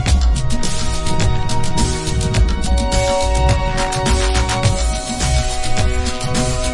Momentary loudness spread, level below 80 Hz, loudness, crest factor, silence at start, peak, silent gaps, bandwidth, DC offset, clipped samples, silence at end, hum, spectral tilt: 4 LU; -18 dBFS; -18 LUFS; 12 dB; 0 s; -2 dBFS; none; 11.5 kHz; under 0.1%; under 0.1%; 0 s; none; -4.5 dB/octave